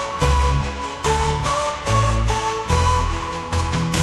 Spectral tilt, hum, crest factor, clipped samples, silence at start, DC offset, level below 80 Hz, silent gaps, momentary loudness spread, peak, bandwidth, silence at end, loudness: -4.5 dB/octave; none; 16 dB; under 0.1%; 0 s; under 0.1%; -26 dBFS; none; 6 LU; -4 dBFS; 13 kHz; 0 s; -20 LUFS